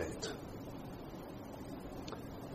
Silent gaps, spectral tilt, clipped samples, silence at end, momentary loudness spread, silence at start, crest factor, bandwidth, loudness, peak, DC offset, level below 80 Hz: none; -5 dB/octave; under 0.1%; 0 s; 5 LU; 0 s; 18 dB; 14 kHz; -47 LUFS; -26 dBFS; under 0.1%; -58 dBFS